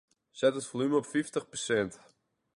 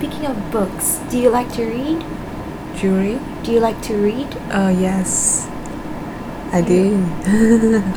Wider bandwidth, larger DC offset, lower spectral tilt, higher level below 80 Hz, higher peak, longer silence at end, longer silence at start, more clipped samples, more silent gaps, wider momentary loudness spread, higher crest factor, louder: second, 11.5 kHz vs over 20 kHz; neither; about the same, -4.5 dB/octave vs -5 dB/octave; second, -70 dBFS vs -36 dBFS; second, -14 dBFS vs -2 dBFS; first, 0.6 s vs 0 s; first, 0.35 s vs 0 s; neither; neither; second, 6 LU vs 14 LU; about the same, 18 dB vs 16 dB; second, -31 LUFS vs -18 LUFS